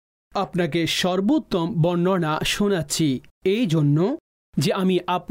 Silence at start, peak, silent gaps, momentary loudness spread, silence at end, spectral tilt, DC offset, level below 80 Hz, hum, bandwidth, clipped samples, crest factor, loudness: 0.35 s; -12 dBFS; 3.31-3.41 s, 4.20-4.53 s; 6 LU; 0.05 s; -5.5 dB/octave; under 0.1%; -50 dBFS; none; 16 kHz; under 0.1%; 10 dB; -22 LUFS